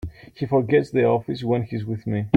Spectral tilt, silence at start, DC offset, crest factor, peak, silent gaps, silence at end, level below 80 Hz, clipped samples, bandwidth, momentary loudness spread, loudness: -9 dB/octave; 0.05 s; under 0.1%; 20 dB; -2 dBFS; none; 0 s; -50 dBFS; under 0.1%; 8.8 kHz; 9 LU; -23 LUFS